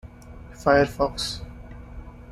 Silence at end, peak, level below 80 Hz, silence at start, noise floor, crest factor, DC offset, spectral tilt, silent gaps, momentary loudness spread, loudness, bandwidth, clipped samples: 0 s; -6 dBFS; -42 dBFS; 0.05 s; -43 dBFS; 20 dB; under 0.1%; -5 dB/octave; none; 24 LU; -23 LUFS; 15 kHz; under 0.1%